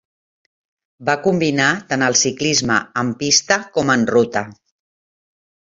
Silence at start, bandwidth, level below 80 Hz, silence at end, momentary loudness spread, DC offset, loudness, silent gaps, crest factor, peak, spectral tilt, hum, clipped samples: 1 s; 8 kHz; -56 dBFS; 1.25 s; 7 LU; under 0.1%; -17 LUFS; none; 18 dB; -2 dBFS; -3 dB/octave; none; under 0.1%